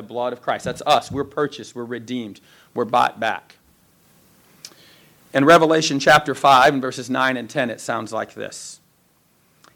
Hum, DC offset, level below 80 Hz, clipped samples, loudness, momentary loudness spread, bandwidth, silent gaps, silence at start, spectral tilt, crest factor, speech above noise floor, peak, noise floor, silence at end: none; under 0.1%; -58 dBFS; under 0.1%; -19 LUFS; 19 LU; 19 kHz; none; 0 s; -4 dB/octave; 18 dB; 41 dB; -2 dBFS; -60 dBFS; 1 s